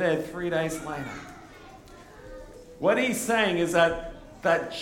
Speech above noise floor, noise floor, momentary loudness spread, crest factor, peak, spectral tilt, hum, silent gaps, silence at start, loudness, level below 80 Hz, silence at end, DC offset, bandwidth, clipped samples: 22 dB; -48 dBFS; 23 LU; 20 dB; -8 dBFS; -4 dB/octave; none; none; 0 s; -26 LUFS; -52 dBFS; 0 s; under 0.1%; 18 kHz; under 0.1%